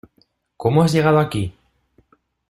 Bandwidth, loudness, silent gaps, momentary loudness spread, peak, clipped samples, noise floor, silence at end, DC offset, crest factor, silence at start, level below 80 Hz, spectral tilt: 13.5 kHz; -18 LUFS; none; 11 LU; -2 dBFS; under 0.1%; -62 dBFS; 1 s; under 0.1%; 18 dB; 0.6 s; -50 dBFS; -7 dB/octave